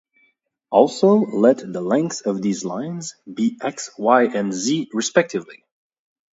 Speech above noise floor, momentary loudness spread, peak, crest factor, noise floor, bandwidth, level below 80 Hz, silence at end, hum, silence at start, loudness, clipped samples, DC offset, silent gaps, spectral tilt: 45 dB; 12 LU; 0 dBFS; 20 dB; -65 dBFS; 8 kHz; -70 dBFS; 0.85 s; none; 0.7 s; -20 LUFS; under 0.1%; under 0.1%; none; -5 dB/octave